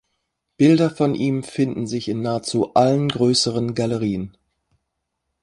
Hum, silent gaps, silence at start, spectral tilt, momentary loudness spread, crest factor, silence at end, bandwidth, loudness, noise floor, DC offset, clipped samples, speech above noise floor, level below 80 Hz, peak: none; none; 0.6 s; -5.5 dB/octave; 9 LU; 18 dB; 1.15 s; 11.5 kHz; -20 LUFS; -77 dBFS; under 0.1%; under 0.1%; 58 dB; -54 dBFS; -2 dBFS